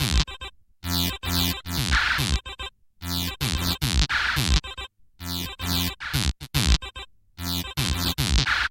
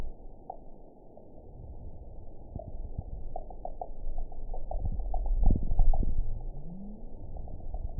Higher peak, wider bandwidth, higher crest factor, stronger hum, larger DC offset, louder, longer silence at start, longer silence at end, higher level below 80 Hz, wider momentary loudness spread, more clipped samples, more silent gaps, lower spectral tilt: first, -2 dBFS vs -10 dBFS; first, 17 kHz vs 1 kHz; about the same, 22 dB vs 20 dB; neither; second, under 0.1% vs 0.1%; first, -25 LUFS vs -38 LUFS; about the same, 0 s vs 0 s; about the same, 0 s vs 0 s; about the same, -30 dBFS vs -32 dBFS; second, 16 LU vs 20 LU; neither; neither; second, -3 dB/octave vs -15.5 dB/octave